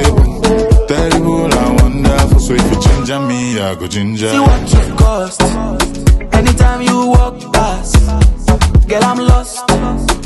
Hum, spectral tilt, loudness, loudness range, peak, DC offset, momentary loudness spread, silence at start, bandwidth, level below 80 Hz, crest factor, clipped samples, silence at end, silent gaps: none; -5.5 dB/octave; -12 LUFS; 2 LU; 0 dBFS; under 0.1%; 5 LU; 0 s; 12.5 kHz; -14 dBFS; 10 dB; 0.4%; 0 s; none